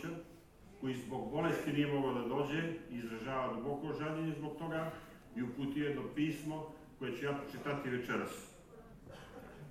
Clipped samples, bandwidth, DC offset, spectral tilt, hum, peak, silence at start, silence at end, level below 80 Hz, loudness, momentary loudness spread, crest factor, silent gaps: under 0.1%; 15.5 kHz; under 0.1%; -6.5 dB/octave; none; -22 dBFS; 0 s; 0 s; -64 dBFS; -39 LUFS; 17 LU; 18 dB; none